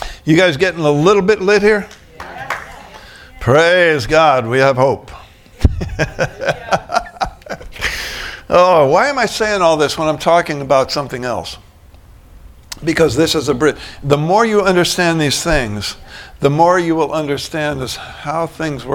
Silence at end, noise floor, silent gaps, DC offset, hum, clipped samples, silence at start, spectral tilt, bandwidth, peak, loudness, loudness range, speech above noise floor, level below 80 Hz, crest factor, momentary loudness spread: 0 s; -41 dBFS; none; under 0.1%; none; under 0.1%; 0 s; -5 dB/octave; 18 kHz; 0 dBFS; -14 LUFS; 4 LU; 28 dB; -32 dBFS; 14 dB; 13 LU